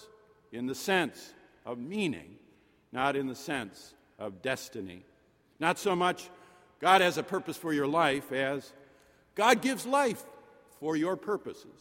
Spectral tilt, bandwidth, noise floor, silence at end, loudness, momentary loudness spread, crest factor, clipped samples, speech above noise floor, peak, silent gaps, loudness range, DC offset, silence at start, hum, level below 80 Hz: -4 dB/octave; 16.5 kHz; -66 dBFS; 0.1 s; -30 LUFS; 18 LU; 24 dB; under 0.1%; 36 dB; -8 dBFS; none; 8 LU; under 0.1%; 0 s; none; -72 dBFS